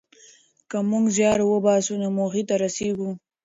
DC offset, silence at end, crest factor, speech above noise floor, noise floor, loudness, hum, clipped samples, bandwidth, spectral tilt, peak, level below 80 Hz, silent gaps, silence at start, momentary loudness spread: under 0.1%; 0.25 s; 16 dB; 32 dB; -54 dBFS; -23 LUFS; none; under 0.1%; 8 kHz; -5 dB/octave; -8 dBFS; -60 dBFS; none; 0.7 s; 9 LU